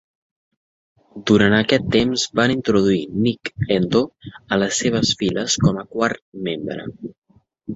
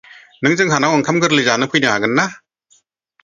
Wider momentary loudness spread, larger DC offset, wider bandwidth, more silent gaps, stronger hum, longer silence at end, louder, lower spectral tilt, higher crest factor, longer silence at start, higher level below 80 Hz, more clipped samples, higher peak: first, 13 LU vs 4 LU; neither; about the same, 8 kHz vs 7.6 kHz; first, 6.22-6.32 s, 7.18-7.22 s vs none; neither; second, 0 s vs 0.85 s; second, -19 LUFS vs -15 LUFS; about the same, -4.5 dB/octave vs -4 dB/octave; about the same, 20 dB vs 18 dB; first, 1.15 s vs 0.4 s; first, -48 dBFS vs -58 dBFS; neither; about the same, -2 dBFS vs 0 dBFS